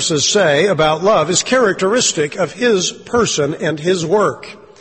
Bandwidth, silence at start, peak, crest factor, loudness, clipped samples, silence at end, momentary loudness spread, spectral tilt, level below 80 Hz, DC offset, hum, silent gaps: 8.8 kHz; 0 s; -2 dBFS; 14 dB; -14 LUFS; under 0.1%; 0.25 s; 6 LU; -3 dB/octave; -50 dBFS; under 0.1%; none; none